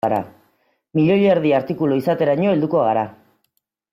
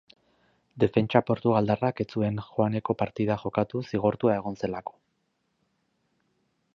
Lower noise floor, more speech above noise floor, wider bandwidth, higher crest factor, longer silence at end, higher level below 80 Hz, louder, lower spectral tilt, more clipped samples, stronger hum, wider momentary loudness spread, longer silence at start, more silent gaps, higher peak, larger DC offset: second, -71 dBFS vs -75 dBFS; first, 53 dB vs 49 dB; first, 14.5 kHz vs 6.8 kHz; second, 14 dB vs 24 dB; second, 0.8 s vs 1.95 s; about the same, -60 dBFS vs -58 dBFS; first, -18 LUFS vs -27 LUFS; about the same, -9 dB/octave vs -9 dB/octave; neither; neither; about the same, 9 LU vs 7 LU; second, 0.05 s vs 0.75 s; neither; about the same, -6 dBFS vs -4 dBFS; neither